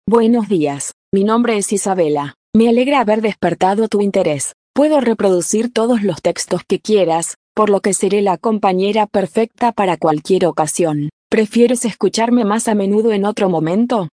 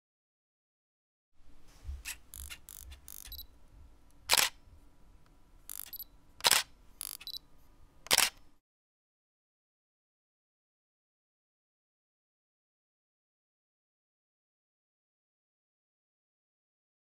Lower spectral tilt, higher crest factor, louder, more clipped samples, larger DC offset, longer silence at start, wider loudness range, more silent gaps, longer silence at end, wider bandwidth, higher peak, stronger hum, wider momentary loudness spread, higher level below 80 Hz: first, -5 dB/octave vs 0.5 dB/octave; second, 14 dB vs 34 dB; first, -15 LUFS vs -30 LUFS; neither; neither; second, 0.05 s vs 1.4 s; second, 1 LU vs 16 LU; first, 0.93-1.12 s, 2.36-2.53 s, 4.54-4.74 s, 7.36-7.55 s, 11.13-11.30 s vs none; second, 0.1 s vs 8.6 s; second, 10.5 kHz vs 16.5 kHz; first, 0 dBFS vs -6 dBFS; neither; second, 5 LU vs 22 LU; about the same, -56 dBFS vs -58 dBFS